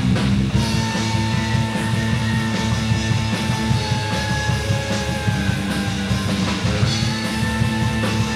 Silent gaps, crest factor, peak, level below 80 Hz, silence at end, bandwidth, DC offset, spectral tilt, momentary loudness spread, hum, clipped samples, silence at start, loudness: none; 14 dB; -6 dBFS; -32 dBFS; 0 s; 14 kHz; under 0.1%; -5 dB/octave; 2 LU; none; under 0.1%; 0 s; -20 LUFS